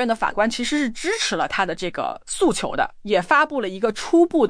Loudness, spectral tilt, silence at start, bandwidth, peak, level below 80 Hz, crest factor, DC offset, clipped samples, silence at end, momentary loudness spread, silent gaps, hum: -21 LUFS; -3.5 dB/octave; 0 s; 10.5 kHz; -6 dBFS; -46 dBFS; 16 dB; under 0.1%; under 0.1%; 0 s; 7 LU; none; none